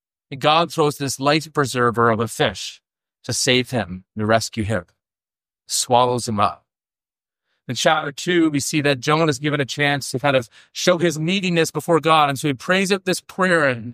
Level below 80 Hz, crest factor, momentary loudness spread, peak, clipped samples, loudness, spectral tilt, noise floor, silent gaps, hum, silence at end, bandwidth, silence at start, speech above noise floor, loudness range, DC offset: -56 dBFS; 18 dB; 8 LU; -2 dBFS; under 0.1%; -19 LUFS; -4 dB/octave; under -90 dBFS; none; none; 0 s; 15.5 kHz; 0.3 s; over 71 dB; 4 LU; under 0.1%